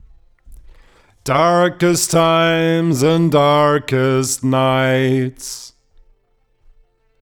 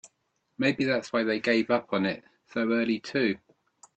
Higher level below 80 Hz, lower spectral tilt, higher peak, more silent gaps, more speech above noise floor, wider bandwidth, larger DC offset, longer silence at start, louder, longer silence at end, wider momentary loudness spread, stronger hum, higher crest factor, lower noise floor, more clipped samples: first, -48 dBFS vs -70 dBFS; about the same, -5 dB/octave vs -5.5 dB/octave; first, -2 dBFS vs -10 dBFS; neither; about the same, 46 dB vs 49 dB; first, over 20 kHz vs 8.6 kHz; neither; first, 0.5 s vs 0.05 s; first, -15 LUFS vs -27 LUFS; first, 1.55 s vs 0.6 s; first, 9 LU vs 6 LU; neither; about the same, 14 dB vs 18 dB; second, -60 dBFS vs -76 dBFS; neither